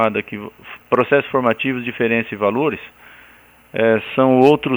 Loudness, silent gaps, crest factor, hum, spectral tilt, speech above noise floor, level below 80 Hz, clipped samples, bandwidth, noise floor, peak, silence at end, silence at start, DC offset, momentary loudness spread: -17 LUFS; none; 18 dB; none; -7.5 dB/octave; 31 dB; -58 dBFS; under 0.1%; over 20 kHz; -48 dBFS; 0 dBFS; 0 s; 0 s; under 0.1%; 18 LU